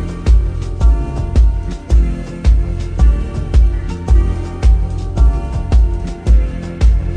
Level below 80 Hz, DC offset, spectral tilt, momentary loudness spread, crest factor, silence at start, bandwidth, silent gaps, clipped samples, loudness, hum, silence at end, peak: -12 dBFS; under 0.1%; -8 dB/octave; 6 LU; 12 dB; 0 s; 7.2 kHz; none; under 0.1%; -16 LUFS; none; 0 s; 0 dBFS